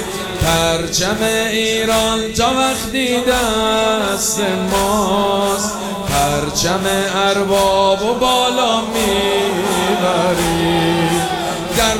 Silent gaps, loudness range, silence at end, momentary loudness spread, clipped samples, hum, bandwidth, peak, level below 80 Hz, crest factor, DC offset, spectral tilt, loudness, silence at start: none; 1 LU; 0 s; 3 LU; under 0.1%; none; over 20 kHz; -4 dBFS; -36 dBFS; 12 dB; 0.2%; -3.5 dB/octave; -15 LUFS; 0 s